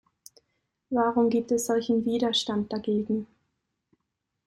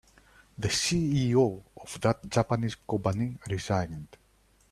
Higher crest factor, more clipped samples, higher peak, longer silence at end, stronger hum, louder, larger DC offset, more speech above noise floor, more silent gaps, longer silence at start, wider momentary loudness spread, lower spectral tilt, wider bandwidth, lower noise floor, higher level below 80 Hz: about the same, 16 dB vs 20 dB; neither; about the same, -12 dBFS vs -10 dBFS; first, 1.2 s vs 0.65 s; neither; first, -26 LUFS vs -29 LUFS; neither; first, 56 dB vs 36 dB; neither; first, 0.9 s vs 0.6 s; second, 7 LU vs 11 LU; about the same, -4.5 dB/octave vs -5 dB/octave; first, 15 kHz vs 13.5 kHz; first, -82 dBFS vs -64 dBFS; second, -66 dBFS vs -54 dBFS